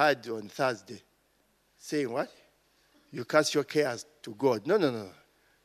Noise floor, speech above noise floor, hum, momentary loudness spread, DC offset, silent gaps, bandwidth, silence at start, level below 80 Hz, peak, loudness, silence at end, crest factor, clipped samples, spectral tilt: -70 dBFS; 41 dB; none; 19 LU; under 0.1%; none; 13.5 kHz; 0 s; -78 dBFS; -8 dBFS; -30 LUFS; 0.55 s; 22 dB; under 0.1%; -4.5 dB/octave